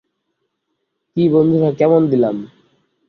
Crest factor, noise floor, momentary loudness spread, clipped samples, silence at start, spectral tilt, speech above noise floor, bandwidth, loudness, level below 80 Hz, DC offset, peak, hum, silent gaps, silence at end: 16 dB; -73 dBFS; 10 LU; under 0.1%; 1.15 s; -10 dB/octave; 59 dB; 6.2 kHz; -15 LUFS; -58 dBFS; under 0.1%; -2 dBFS; none; none; 0.6 s